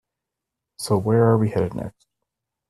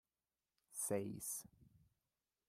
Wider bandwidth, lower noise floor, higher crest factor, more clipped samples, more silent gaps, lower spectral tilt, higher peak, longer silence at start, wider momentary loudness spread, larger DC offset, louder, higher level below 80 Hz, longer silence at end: second, 13 kHz vs 15.5 kHz; second, -84 dBFS vs under -90 dBFS; about the same, 20 dB vs 22 dB; neither; neither; first, -7 dB/octave vs -4.5 dB/octave; first, -4 dBFS vs -28 dBFS; about the same, 0.8 s vs 0.7 s; first, 16 LU vs 11 LU; neither; first, -20 LUFS vs -45 LUFS; first, -56 dBFS vs -82 dBFS; about the same, 0.8 s vs 0.8 s